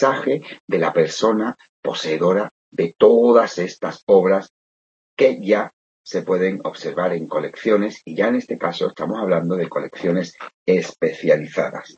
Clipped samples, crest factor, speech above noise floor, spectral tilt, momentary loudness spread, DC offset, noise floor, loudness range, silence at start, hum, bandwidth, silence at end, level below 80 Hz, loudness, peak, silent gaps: under 0.1%; 18 dB; over 71 dB; -6 dB/octave; 12 LU; under 0.1%; under -90 dBFS; 4 LU; 0 s; none; 8 kHz; 0.15 s; -66 dBFS; -20 LUFS; -2 dBFS; 0.60-0.68 s, 1.69-1.83 s, 2.51-2.72 s, 4.03-4.07 s, 4.50-5.17 s, 5.73-6.04 s, 10.54-10.66 s